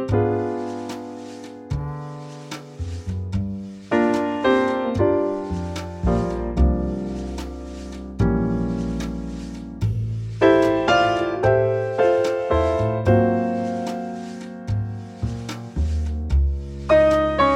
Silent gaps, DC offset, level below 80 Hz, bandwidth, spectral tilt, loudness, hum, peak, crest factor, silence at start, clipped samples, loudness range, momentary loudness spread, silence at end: none; under 0.1%; -30 dBFS; 11 kHz; -7.5 dB/octave; -22 LUFS; none; -4 dBFS; 18 dB; 0 s; under 0.1%; 7 LU; 16 LU; 0 s